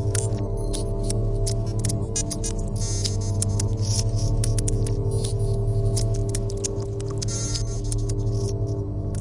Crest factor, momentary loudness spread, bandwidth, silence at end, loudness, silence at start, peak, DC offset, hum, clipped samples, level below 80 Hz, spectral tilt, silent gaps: 18 dB; 4 LU; 11.5 kHz; 0 s; -26 LUFS; 0 s; -6 dBFS; under 0.1%; 50 Hz at -30 dBFS; under 0.1%; -30 dBFS; -5.5 dB/octave; none